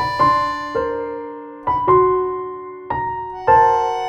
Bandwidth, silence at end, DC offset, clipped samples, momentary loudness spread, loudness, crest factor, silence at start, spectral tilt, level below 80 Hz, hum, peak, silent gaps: 9.4 kHz; 0 s; under 0.1%; under 0.1%; 15 LU; -18 LUFS; 16 dB; 0 s; -6 dB/octave; -46 dBFS; none; -2 dBFS; none